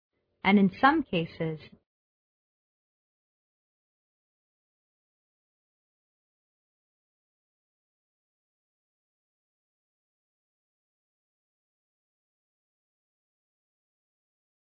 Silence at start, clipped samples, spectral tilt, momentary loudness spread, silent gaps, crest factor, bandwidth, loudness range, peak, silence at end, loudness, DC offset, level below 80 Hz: 0.45 s; under 0.1%; -4.5 dB/octave; 13 LU; none; 28 dB; 5.2 kHz; 15 LU; -8 dBFS; 13.05 s; -26 LUFS; under 0.1%; -70 dBFS